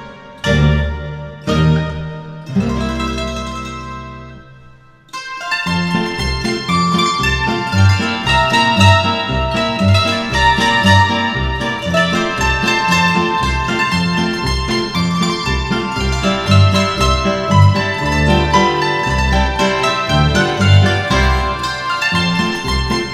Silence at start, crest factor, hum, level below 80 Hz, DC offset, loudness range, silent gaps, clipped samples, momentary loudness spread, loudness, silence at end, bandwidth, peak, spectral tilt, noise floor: 0 s; 14 dB; none; -26 dBFS; under 0.1%; 8 LU; none; under 0.1%; 11 LU; -14 LUFS; 0 s; 13.5 kHz; 0 dBFS; -5 dB/octave; -42 dBFS